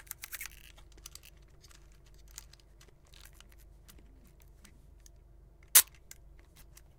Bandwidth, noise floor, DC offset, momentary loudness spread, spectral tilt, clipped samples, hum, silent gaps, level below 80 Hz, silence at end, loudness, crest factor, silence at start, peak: 18 kHz; -59 dBFS; under 0.1%; 32 LU; 1.5 dB/octave; under 0.1%; none; none; -58 dBFS; 1.15 s; -26 LUFS; 36 dB; 0.3 s; -2 dBFS